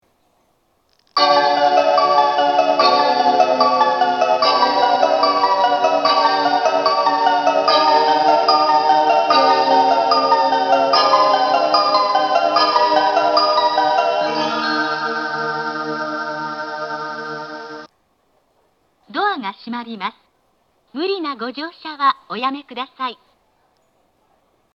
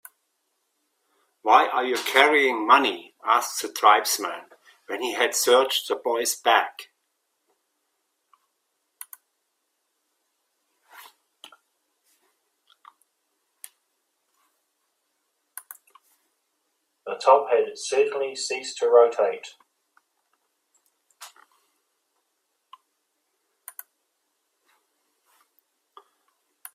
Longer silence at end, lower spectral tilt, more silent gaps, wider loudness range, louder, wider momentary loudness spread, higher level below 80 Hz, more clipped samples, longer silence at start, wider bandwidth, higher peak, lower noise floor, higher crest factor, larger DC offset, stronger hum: second, 1.6 s vs 5.45 s; first, -3 dB/octave vs 0 dB/octave; neither; first, 13 LU vs 8 LU; first, -16 LUFS vs -21 LUFS; second, 13 LU vs 24 LU; first, -72 dBFS vs -82 dBFS; neither; second, 1.15 s vs 1.45 s; second, 7 kHz vs 16 kHz; about the same, 0 dBFS vs 0 dBFS; second, -62 dBFS vs -76 dBFS; second, 16 dB vs 26 dB; neither; neither